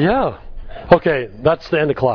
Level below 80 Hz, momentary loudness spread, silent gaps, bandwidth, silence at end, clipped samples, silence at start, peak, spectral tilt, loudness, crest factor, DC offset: -36 dBFS; 22 LU; none; 5.4 kHz; 0 s; under 0.1%; 0 s; 0 dBFS; -8.5 dB/octave; -17 LUFS; 16 dB; under 0.1%